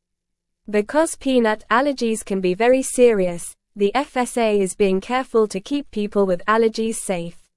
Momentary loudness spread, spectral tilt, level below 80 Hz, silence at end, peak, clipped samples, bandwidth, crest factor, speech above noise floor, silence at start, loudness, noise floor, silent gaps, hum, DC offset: 8 LU; -4.5 dB/octave; -50 dBFS; 0.2 s; -4 dBFS; under 0.1%; 12 kHz; 16 dB; 58 dB; 0.7 s; -20 LUFS; -78 dBFS; none; none; under 0.1%